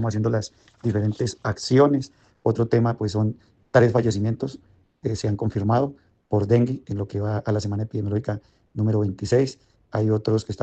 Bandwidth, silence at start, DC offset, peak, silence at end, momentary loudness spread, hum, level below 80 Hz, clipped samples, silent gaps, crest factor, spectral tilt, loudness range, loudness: 8.6 kHz; 0 s; under 0.1%; -2 dBFS; 0 s; 11 LU; none; -54 dBFS; under 0.1%; none; 20 dB; -7.5 dB/octave; 3 LU; -23 LUFS